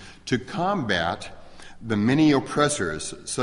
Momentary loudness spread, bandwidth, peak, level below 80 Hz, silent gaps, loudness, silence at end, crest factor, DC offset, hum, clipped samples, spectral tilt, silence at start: 13 LU; 11.5 kHz; -6 dBFS; -50 dBFS; none; -24 LUFS; 0 s; 18 dB; under 0.1%; none; under 0.1%; -4.5 dB/octave; 0 s